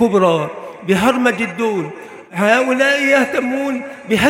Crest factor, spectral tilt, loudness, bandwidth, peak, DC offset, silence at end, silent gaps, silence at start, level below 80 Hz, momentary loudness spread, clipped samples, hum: 16 dB; -5 dB/octave; -16 LUFS; 16.5 kHz; 0 dBFS; under 0.1%; 0 s; none; 0 s; -52 dBFS; 13 LU; under 0.1%; none